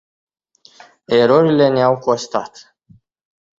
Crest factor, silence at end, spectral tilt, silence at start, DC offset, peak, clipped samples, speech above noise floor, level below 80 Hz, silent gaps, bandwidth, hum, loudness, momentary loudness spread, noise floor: 16 dB; 1.1 s; -6 dB/octave; 1.1 s; under 0.1%; -2 dBFS; under 0.1%; 37 dB; -60 dBFS; none; 7.8 kHz; none; -15 LUFS; 12 LU; -52 dBFS